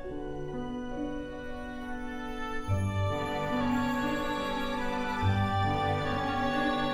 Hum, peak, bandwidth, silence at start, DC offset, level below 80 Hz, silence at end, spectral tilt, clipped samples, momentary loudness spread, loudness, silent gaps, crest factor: none; -16 dBFS; 13.5 kHz; 0 s; under 0.1%; -44 dBFS; 0 s; -6.5 dB/octave; under 0.1%; 10 LU; -32 LUFS; none; 16 dB